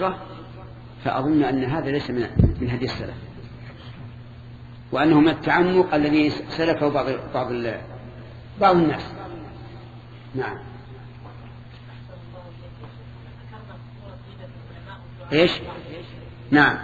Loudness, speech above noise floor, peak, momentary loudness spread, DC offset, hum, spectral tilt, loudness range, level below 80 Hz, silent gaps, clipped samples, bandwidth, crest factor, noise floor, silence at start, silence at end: -21 LUFS; 20 dB; -2 dBFS; 23 LU; under 0.1%; none; -7.5 dB/octave; 20 LU; -40 dBFS; none; under 0.1%; 7.4 kHz; 22 dB; -41 dBFS; 0 s; 0 s